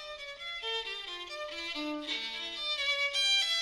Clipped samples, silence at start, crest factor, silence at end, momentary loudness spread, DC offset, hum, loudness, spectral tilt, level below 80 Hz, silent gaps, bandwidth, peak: under 0.1%; 0 s; 16 dB; 0 s; 13 LU; under 0.1%; none; -32 LUFS; 0.5 dB/octave; -66 dBFS; none; 16 kHz; -18 dBFS